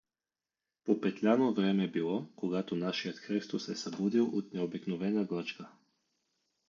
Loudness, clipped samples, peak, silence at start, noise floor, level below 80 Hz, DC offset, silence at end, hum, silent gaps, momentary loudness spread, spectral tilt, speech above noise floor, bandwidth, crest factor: -33 LUFS; under 0.1%; -16 dBFS; 0.85 s; under -90 dBFS; -78 dBFS; under 0.1%; 1 s; none; none; 9 LU; -6.5 dB/octave; over 57 dB; 7.4 kHz; 18 dB